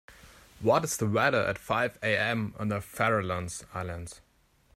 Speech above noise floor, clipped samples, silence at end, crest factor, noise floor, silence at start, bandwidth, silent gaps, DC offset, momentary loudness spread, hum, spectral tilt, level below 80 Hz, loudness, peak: 25 dB; under 0.1%; 0.55 s; 18 dB; -54 dBFS; 0.1 s; 16 kHz; none; under 0.1%; 11 LU; none; -4.5 dB/octave; -58 dBFS; -29 LUFS; -12 dBFS